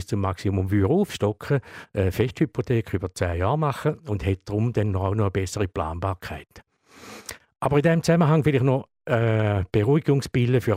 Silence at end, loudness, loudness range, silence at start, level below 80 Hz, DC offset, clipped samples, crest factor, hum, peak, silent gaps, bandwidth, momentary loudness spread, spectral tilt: 0 s; -24 LUFS; 5 LU; 0 s; -46 dBFS; under 0.1%; under 0.1%; 16 dB; none; -6 dBFS; none; 16 kHz; 10 LU; -7 dB/octave